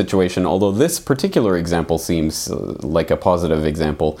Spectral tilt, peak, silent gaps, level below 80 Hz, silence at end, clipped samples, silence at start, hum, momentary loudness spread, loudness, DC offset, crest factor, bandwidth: -5.5 dB/octave; 0 dBFS; none; -40 dBFS; 0 s; under 0.1%; 0 s; none; 4 LU; -18 LUFS; under 0.1%; 18 dB; 17 kHz